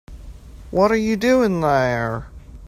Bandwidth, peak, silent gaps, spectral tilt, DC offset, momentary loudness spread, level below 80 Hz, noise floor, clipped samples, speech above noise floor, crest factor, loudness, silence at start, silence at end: 16 kHz; -4 dBFS; none; -6.5 dB/octave; under 0.1%; 9 LU; -40 dBFS; -38 dBFS; under 0.1%; 20 dB; 16 dB; -19 LUFS; 0.1 s; 0 s